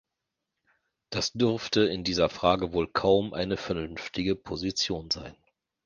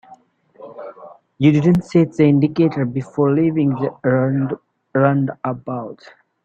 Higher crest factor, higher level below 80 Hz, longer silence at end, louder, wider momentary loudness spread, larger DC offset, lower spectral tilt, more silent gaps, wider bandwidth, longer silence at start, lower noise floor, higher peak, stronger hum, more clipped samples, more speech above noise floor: first, 22 dB vs 16 dB; about the same, -52 dBFS vs -54 dBFS; about the same, 0.5 s vs 0.5 s; second, -28 LUFS vs -18 LUFS; second, 8 LU vs 16 LU; neither; second, -4.5 dB/octave vs -9 dB/octave; neither; first, 10 kHz vs 7.8 kHz; first, 1.1 s vs 0.1 s; first, -85 dBFS vs -48 dBFS; second, -8 dBFS vs -2 dBFS; neither; neither; first, 58 dB vs 31 dB